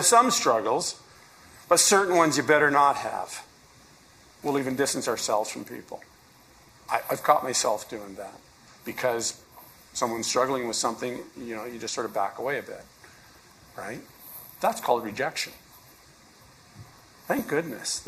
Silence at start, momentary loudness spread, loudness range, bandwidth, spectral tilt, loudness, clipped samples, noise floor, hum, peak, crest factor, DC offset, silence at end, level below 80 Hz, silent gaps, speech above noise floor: 0 s; 21 LU; 9 LU; 15.5 kHz; -2 dB/octave; -25 LUFS; under 0.1%; -55 dBFS; none; -6 dBFS; 22 dB; under 0.1%; 0 s; -66 dBFS; none; 29 dB